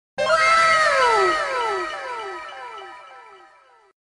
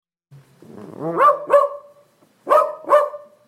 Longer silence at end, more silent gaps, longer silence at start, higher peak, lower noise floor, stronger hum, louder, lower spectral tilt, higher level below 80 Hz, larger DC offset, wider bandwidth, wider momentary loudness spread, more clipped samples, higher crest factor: first, 0.8 s vs 0.3 s; neither; second, 0.15 s vs 0.75 s; about the same, -4 dBFS vs -2 dBFS; about the same, -53 dBFS vs -55 dBFS; neither; about the same, -18 LUFS vs -17 LUFS; second, -1.5 dB/octave vs -5.5 dB/octave; first, -56 dBFS vs -72 dBFS; neither; second, 10.5 kHz vs 13.5 kHz; about the same, 21 LU vs 21 LU; neither; about the same, 18 dB vs 18 dB